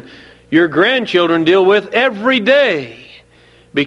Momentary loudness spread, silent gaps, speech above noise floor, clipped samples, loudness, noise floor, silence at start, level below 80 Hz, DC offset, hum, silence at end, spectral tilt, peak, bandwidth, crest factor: 7 LU; none; 35 dB; under 0.1%; -13 LUFS; -47 dBFS; 0.5 s; -56 dBFS; under 0.1%; 60 Hz at -50 dBFS; 0 s; -5.5 dB/octave; 0 dBFS; 8.6 kHz; 14 dB